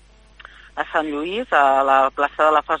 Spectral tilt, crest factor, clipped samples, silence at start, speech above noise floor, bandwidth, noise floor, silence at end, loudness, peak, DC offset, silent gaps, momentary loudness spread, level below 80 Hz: -4 dB/octave; 18 dB; under 0.1%; 0.75 s; 27 dB; 9.8 kHz; -46 dBFS; 0 s; -18 LUFS; -2 dBFS; under 0.1%; none; 10 LU; -52 dBFS